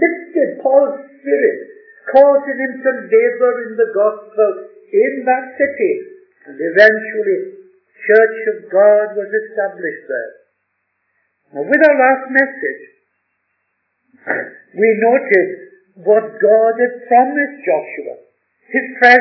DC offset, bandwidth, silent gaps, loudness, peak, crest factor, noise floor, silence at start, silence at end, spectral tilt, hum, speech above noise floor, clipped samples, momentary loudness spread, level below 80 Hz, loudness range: under 0.1%; 5.4 kHz; none; -14 LUFS; 0 dBFS; 16 dB; -69 dBFS; 0 s; 0 s; -6.5 dB/octave; none; 55 dB; 0.2%; 15 LU; -66 dBFS; 4 LU